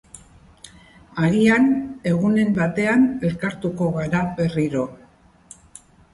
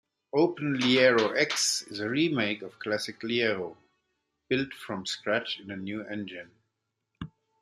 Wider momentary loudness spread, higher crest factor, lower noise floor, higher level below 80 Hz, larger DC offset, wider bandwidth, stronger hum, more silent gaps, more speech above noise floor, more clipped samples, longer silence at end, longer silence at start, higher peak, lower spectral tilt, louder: second, 9 LU vs 17 LU; second, 16 dB vs 22 dB; second, -52 dBFS vs -82 dBFS; first, -50 dBFS vs -68 dBFS; neither; second, 11.5 kHz vs 13.5 kHz; neither; neither; second, 33 dB vs 53 dB; neither; first, 1.2 s vs 0.35 s; second, 0.15 s vs 0.35 s; about the same, -6 dBFS vs -8 dBFS; first, -7 dB/octave vs -3.5 dB/octave; first, -20 LUFS vs -28 LUFS